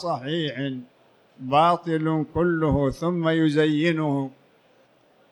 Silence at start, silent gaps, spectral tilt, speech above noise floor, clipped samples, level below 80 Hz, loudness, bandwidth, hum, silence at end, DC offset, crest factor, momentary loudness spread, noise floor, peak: 0 s; none; -7.5 dB/octave; 36 dB; under 0.1%; -46 dBFS; -23 LUFS; 11 kHz; none; 1.05 s; under 0.1%; 16 dB; 11 LU; -59 dBFS; -8 dBFS